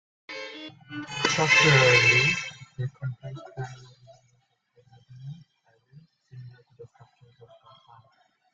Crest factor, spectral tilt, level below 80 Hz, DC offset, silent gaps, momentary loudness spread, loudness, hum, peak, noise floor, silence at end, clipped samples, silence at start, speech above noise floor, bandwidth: 22 dB; -3.5 dB/octave; -62 dBFS; under 0.1%; none; 26 LU; -20 LUFS; none; -6 dBFS; -69 dBFS; 1.7 s; under 0.1%; 0.3 s; 44 dB; 9.2 kHz